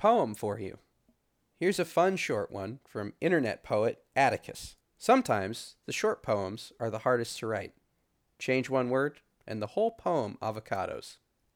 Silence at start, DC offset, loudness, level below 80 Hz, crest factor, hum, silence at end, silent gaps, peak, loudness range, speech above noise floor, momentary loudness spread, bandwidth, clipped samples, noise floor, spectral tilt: 0 s; under 0.1%; -31 LUFS; -68 dBFS; 20 dB; none; 0.4 s; none; -10 dBFS; 3 LU; 45 dB; 13 LU; 18.5 kHz; under 0.1%; -75 dBFS; -5 dB/octave